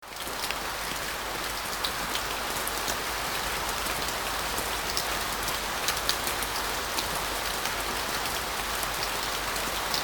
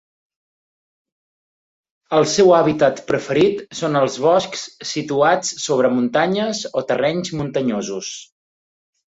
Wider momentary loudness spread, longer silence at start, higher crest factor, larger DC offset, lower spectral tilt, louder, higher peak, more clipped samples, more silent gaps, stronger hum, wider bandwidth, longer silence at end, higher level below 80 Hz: second, 3 LU vs 12 LU; second, 0 s vs 2.1 s; first, 26 dB vs 18 dB; neither; second, -1 dB/octave vs -4.5 dB/octave; second, -29 LUFS vs -18 LUFS; second, -6 dBFS vs -2 dBFS; neither; neither; neither; first, 19 kHz vs 8 kHz; second, 0 s vs 0.95 s; first, -46 dBFS vs -58 dBFS